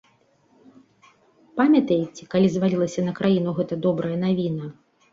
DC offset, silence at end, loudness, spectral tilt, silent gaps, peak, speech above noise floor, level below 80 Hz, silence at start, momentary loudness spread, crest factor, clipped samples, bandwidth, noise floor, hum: under 0.1%; 0.4 s; -22 LUFS; -7.5 dB/octave; none; -8 dBFS; 40 dB; -62 dBFS; 1.55 s; 9 LU; 16 dB; under 0.1%; 7.6 kHz; -61 dBFS; none